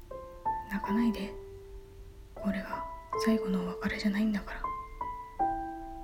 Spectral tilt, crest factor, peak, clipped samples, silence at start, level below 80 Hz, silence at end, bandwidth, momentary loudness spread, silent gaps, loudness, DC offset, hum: -6.5 dB/octave; 18 dB; -16 dBFS; under 0.1%; 0 s; -48 dBFS; 0 s; 16.5 kHz; 19 LU; none; -33 LUFS; under 0.1%; none